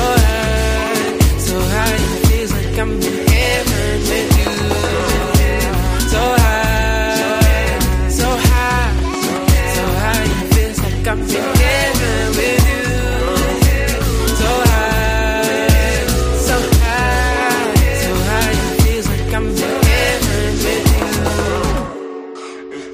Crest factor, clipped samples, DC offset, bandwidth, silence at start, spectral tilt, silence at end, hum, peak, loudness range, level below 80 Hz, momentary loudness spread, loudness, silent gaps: 14 dB; under 0.1%; under 0.1%; 15.5 kHz; 0 s; -4.5 dB/octave; 0 s; none; 0 dBFS; 1 LU; -18 dBFS; 5 LU; -15 LUFS; none